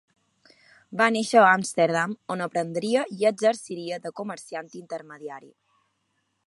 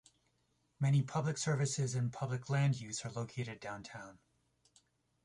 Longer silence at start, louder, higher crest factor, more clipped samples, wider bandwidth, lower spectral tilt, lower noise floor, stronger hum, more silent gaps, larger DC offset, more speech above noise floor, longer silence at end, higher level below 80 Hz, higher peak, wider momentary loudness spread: about the same, 0.9 s vs 0.8 s; first, -23 LUFS vs -37 LUFS; first, 24 dB vs 16 dB; neither; about the same, 11.5 kHz vs 11.5 kHz; about the same, -4.5 dB/octave vs -5.5 dB/octave; second, -74 dBFS vs -78 dBFS; neither; neither; neither; first, 49 dB vs 42 dB; about the same, 1.1 s vs 1.1 s; second, -78 dBFS vs -72 dBFS; first, -2 dBFS vs -22 dBFS; first, 19 LU vs 13 LU